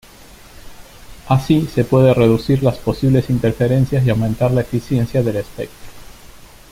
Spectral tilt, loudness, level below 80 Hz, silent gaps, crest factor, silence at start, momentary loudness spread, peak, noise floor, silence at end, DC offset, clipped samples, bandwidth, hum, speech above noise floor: -8 dB/octave; -16 LUFS; -38 dBFS; none; 16 dB; 0.65 s; 7 LU; -2 dBFS; -41 dBFS; 0.25 s; under 0.1%; under 0.1%; 16 kHz; none; 26 dB